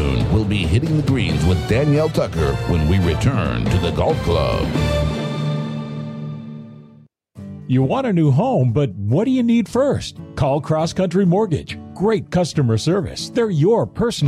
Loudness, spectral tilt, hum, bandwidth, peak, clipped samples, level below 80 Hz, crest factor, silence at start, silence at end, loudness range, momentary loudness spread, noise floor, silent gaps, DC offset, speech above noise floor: -19 LUFS; -7 dB/octave; none; 14 kHz; -6 dBFS; under 0.1%; -32 dBFS; 12 dB; 0 s; 0 s; 5 LU; 11 LU; -48 dBFS; none; under 0.1%; 31 dB